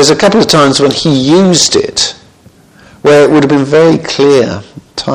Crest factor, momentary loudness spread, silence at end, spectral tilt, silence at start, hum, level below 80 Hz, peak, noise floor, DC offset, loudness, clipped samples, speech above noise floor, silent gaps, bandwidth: 8 dB; 8 LU; 0 s; -4 dB/octave; 0 s; none; -42 dBFS; 0 dBFS; -41 dBFS; under 0.1%; -7 LUFS; 2%; 34 dB; none; 17 kHz